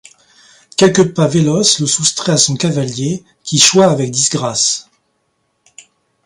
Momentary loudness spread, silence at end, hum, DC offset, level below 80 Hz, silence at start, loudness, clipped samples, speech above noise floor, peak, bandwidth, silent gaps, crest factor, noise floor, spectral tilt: 11 LU; 1.45 s; none; under 0.1%; -54 dBFS; 0.8 s; -12 LUFS; under 0.1%; 52 dB; 0 dBFS; 16 kHz; none; 14 dB; -65 dBFS; -3.5 dB/octave